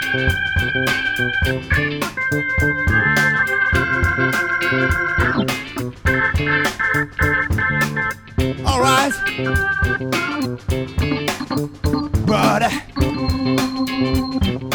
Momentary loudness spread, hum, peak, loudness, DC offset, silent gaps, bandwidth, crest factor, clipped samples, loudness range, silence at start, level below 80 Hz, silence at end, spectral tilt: 7 LU; none; -2 dBFS; -18 LUFS; under 0.1%; none; over 20 kHz; 16 dB; under 0.1%; 3 LU; 0 s; -30 dBFS; 0 s; -5 dB/octave